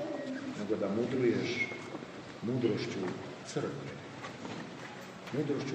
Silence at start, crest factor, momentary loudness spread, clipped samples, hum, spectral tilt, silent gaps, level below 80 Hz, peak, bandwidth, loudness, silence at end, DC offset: 0 s; 18 dB; 14 LU; under 0.1%; none; -6 dB/octave; none; -74 dBFS; -18 dBFS; 9.4 kHz; -36 LUFS; 0 s; under 0.1%